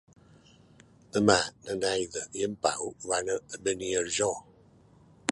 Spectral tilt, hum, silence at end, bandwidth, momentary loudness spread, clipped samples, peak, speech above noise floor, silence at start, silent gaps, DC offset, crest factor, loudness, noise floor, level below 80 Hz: -3 dB/octave; none; 0 s; 11.5 kHz; 10 LU; under 0.1%; -4 dBFS; 29 dB; 1.15 s; none; under 0.1%; 28 dB; -29 LUFS; -58 dBFS; -60 dBFS